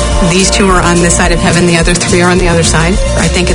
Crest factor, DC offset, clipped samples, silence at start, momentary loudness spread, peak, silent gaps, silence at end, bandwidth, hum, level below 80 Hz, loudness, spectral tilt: 8 dB; under 0.1%; 0.7%; 0 s; 3 LU; 0 dBFS; none; 0 s; 11.5 kHz; none; -16 dBFS; -8 LUFS; -4 dB/octave